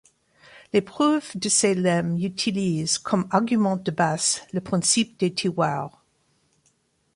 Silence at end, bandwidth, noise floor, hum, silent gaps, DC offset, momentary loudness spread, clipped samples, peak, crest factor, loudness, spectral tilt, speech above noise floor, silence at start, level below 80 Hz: 1.25 s; 11.5 kHz; -67 dBFS; none; none; under 0.1%; 5 LU; under 0.1%; -6 dBFS; 20 dB; -23 LUFS; -4 dB/octave; 44 dB; 0.55 s; -62 dBFS